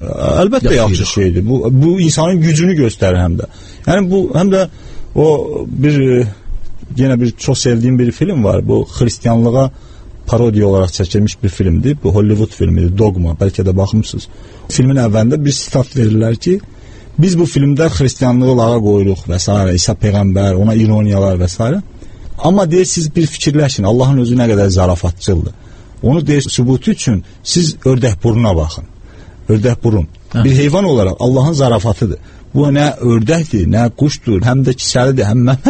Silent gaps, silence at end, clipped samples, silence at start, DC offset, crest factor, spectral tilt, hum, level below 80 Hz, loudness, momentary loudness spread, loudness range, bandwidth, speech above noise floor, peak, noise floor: none; 0 s; under 0.1%; 0 s; under 0.1%; 12 dB; -6.5 dB/octave; none; -28 dBFS; -12 LUFS; 6 LU; 2 LU; 8.8 kHz; 23 dB; 0 dBFS; -34 dBFS